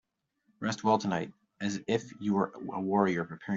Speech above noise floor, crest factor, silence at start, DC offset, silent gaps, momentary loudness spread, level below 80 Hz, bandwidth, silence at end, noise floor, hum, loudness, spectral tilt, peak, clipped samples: 44 dB; 20 dB; 0.6 s; under 0.1%; none; 9 LU; -72 dBFS; 7.6 kHz; 0 s; -75 dBFS; none; -31 LUFS; -6 dB/octave; -12 dBFS; under 0.1%